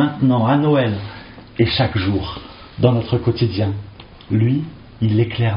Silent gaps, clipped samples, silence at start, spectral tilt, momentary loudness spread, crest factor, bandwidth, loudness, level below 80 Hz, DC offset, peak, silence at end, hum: none; under 0.1%; 0 s; -6.5 dB/octave; 17 LU; 16 dB; 5.4 kHz; -18 LUFS; -42 dBFS; under 0.1%; -2 dBFS; 0 s; none